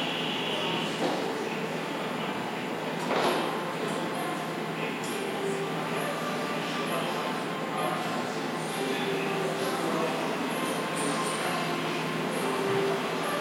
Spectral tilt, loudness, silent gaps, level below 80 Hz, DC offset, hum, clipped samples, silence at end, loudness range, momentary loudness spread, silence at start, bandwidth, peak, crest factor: -4 dB/octave; -30 LUFS; none; -78 dBFS; under 0.1%; none; under 0.1%; 0 s; 2 LU; 4 LU; 0 s; 16.5 kHz; -14 dBFS; 16 dB